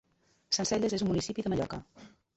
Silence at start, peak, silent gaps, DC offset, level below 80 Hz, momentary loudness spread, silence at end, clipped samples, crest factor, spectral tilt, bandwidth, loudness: 0.5 s; -16 dBFS; none; under 0.1%; -56 dBFS; 7 LU; 0.3 s; under 0.1%; 16 dB; -4.5 dB/octave; 8.6 kHz; -31 LUFS